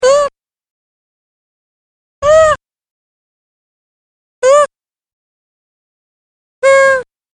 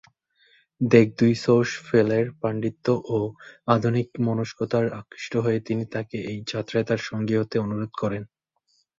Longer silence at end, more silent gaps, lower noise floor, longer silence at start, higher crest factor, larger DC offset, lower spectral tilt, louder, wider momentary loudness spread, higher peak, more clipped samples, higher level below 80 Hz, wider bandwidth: second, 0.3 s vs 0.75 s; first, 0.70-2.22 s, 2.90-4.42 s, 5.13-6.62 s vs none; first, under -90 dBFS vs -69 dBFS; second, 0 s vs 0.8 s; second, 16 dB vs 22 dB; neither; second, -1.5 dB/octave vs -7 dB/octave; first, -11 LUFS vs -24 LUFS; about the same, 9 LU vs 11 LU; about the same, 0 dBFS vs -2 dBFS; neither; first, -46 dBFS vs -60 dBFS; first, 10.5 kHz vs 7.8 kHz